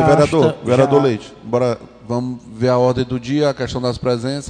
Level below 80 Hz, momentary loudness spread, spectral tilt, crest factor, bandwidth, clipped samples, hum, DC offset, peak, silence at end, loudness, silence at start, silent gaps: -44 dBFS; 10 LU; -6.5 dB/octave; 14 dB; 10 kHz; under 0.1%; none; under 0.1%; -2 dBFS; 0 s; -17 LUFS; 0 s; none